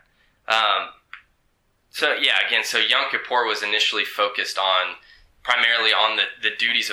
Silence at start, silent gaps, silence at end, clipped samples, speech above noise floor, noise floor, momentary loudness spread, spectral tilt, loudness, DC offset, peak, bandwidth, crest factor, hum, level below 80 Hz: 0.5 s; none; 0 s; under 0.1%; 45 dB; -66 dBFS; 7 LU; 0.5 dB/octave; -19 LUFS; under 0.1%; -4 dBFS; 19.5 kHz; 20 dB; none; -66 dBFS